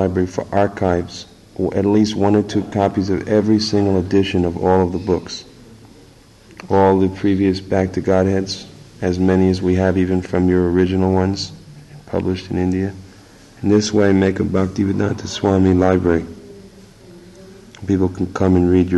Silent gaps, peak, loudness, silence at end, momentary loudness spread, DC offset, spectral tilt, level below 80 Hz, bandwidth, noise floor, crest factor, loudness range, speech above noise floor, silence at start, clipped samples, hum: none; -4 dBFS; -17 LUFS; 0 s; 10 LU; under 0.1%; -7 dB/octave; -44 dBFS; 10.5 kHz; -46 dBFS; 14 dB; 3 LU; 29 dB; 0 s; under 0.1%; none